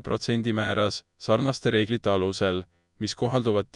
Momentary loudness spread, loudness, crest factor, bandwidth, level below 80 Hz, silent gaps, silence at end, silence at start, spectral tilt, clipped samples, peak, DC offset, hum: 8 LU; -26 LUFS; 16 dB; 11 kHz; -56 dBFS; none; 0.1 s; 0.05 s; -5.5 dB/octave; under 0.1%; -10 dBFS; under 0.1%; none